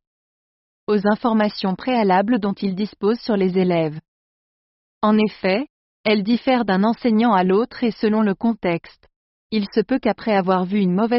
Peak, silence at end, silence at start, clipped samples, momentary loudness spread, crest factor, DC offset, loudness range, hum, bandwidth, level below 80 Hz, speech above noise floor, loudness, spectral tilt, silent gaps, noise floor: -4 dBFS; 0 s; 0.9 s; under 0.1%; 7 LU; 16 dB; under 0.1%; 3 LU; none; 5.8 kHz; -58 dBFS; over 71 dB; -20 LUFS; -5.5 dB/octave; 4.08-5.01 s, 5.70-6.04 s, 9.16-9.50 s; under -90 dBFS